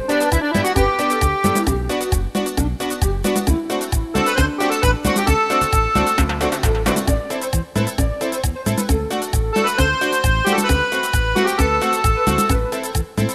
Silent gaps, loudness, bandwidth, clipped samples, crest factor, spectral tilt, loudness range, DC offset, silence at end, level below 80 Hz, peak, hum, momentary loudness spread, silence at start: none; -19 LUFS; 14 kHz; under 0.1%; 16 dB; -5 dB/octave; 3 LU; 0.2%; 0 s; -24 dBFS; -2 dBFS; none; 5 LU; 0 s